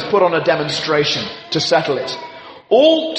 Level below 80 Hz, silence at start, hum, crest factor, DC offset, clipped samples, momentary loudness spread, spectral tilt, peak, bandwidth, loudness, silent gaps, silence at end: -58 dBFS; 0 s; none; 16 dB; under 0.1%; under 0.1%; 14 LU; -4 dB/octave; -2 dBFS; 8.6 kHz; -16 LUFS; none; 0 s